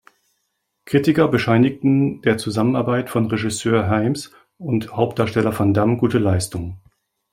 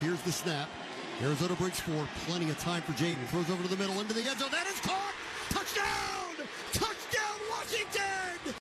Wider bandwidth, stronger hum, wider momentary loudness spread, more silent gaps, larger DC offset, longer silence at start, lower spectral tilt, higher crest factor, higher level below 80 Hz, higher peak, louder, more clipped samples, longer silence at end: first, 16 kHz vs 14 kHz; neither; about the same, 8 LU vs 6 LU; neither; neither; first, 0.85 s vs 0 s; first, -6.5 dB/octave vs -3.5 dB/octave; about the same, 18 dB vs 16 dB; first, -52 dBFS vs -58 dBFS; first, -2 dBFS vs -18 dBFS; first, -19 LUFS vs -33 LUFS; neither; first, 0.55 s vs 0.1 s